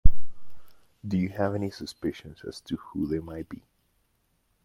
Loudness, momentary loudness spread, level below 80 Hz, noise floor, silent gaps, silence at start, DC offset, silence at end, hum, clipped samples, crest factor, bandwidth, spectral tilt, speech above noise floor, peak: -33 LUFS; 14 LU; -36 dBFS; -71 dBFS; none; 0.05 s; under 0.1%; 1.1 s; none; under 0.1%; 22 dB; 7.2 kHz; -7.5 dB/octave; 40 dB; -2 dBFS